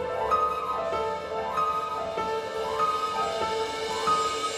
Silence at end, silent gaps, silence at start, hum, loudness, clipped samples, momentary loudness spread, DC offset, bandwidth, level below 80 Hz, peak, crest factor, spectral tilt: 0 s; none; 0 s; none; -28 LUFS; under 0.1%; 5 LU; under 0.1%; 16 kHz; -56 dBFS; -12 dBFS; 14 dB; -3 dB/octave